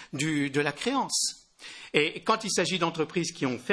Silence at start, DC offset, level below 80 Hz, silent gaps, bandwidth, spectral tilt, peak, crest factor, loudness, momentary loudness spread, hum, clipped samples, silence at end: 0 s; under 0.1%; -66 dBFS; none; 11 kHz; -3.5 dB/octave; -6 dBFS; 22 dB; -28 LUFS; 6 LU; none; under 0.1%; 0 s